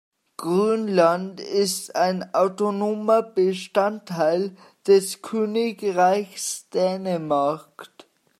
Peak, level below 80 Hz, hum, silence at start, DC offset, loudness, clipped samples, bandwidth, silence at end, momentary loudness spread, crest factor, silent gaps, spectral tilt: -6 dBFS; -76 dBFS; none; 0.4 s; under 0.1%; -22 LUFS; under 0.1%; 14.5 kHz; 0.55 s; 9 LU; 18 dB; none; -4.5 dB/octave